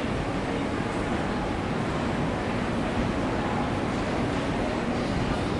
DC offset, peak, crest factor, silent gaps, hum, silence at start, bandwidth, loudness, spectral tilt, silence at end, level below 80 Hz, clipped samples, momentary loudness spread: under 0.1%; -14 dBFS; 12 dB; none; none; 0 s; 11.5 kHz; -28 LUFS; -6.5 dB/octave; 0 s; -40 dBFS; under 0.1%; 1 LU